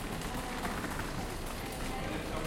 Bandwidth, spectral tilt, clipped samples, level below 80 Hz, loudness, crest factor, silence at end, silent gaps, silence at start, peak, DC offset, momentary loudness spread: 16.5 kHz; -4.5 dB/octave; under 0.1%; -44 dBFS; -38 LUFS; 16 dB; 0 s; none; 0 s; -22 dBFS; under 0.1%; 3 LU